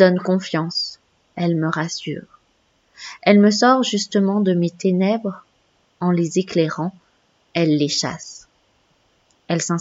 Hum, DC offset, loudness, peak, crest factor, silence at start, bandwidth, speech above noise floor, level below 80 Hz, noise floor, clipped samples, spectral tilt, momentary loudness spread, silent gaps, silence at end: none; under 0.1%; -19 LUFS; 0 dBFS; 20 dB; 0 s; 8 kHz; 44 dB; -68 dBFS; -63 dBFS; under 0.1%; -5.5 dB/octave; 16 LU; none; 0 s